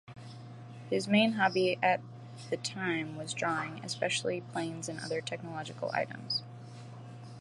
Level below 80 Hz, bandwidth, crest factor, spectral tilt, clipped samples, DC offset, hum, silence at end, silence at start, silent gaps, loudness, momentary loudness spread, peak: -76 dBFS; 11.5 kHz; 22 dB; -4.5 dB/octave; under 0.1%; under 0.1%; none; 0 s; 0.05 s; none; -33 LUFS; 20 LU; -12 dBFS